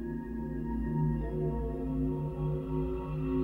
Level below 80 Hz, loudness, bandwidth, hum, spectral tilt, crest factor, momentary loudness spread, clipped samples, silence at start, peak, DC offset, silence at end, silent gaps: -40 dBFS; -34 LUFS; 3.6 kHz; none; -11 dB/octave; 12 dB; 5 LU; under 0.1%; 0 s; -20 dBFS; under 0.1%; 0 s; none